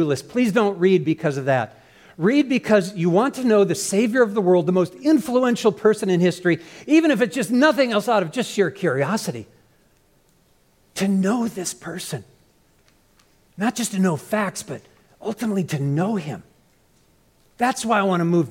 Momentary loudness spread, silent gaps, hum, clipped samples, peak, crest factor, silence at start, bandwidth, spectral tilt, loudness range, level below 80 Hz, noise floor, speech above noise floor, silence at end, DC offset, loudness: 12 LU; none; none; under 0.1%; -4 dBFS; 16 dB; 0 s; 17 kHz; -5.5 dB/octave; 8 LU; -64 dBFS; -59 dBFS; 40 dB; 0 s; under 0.1%; -20 LUFS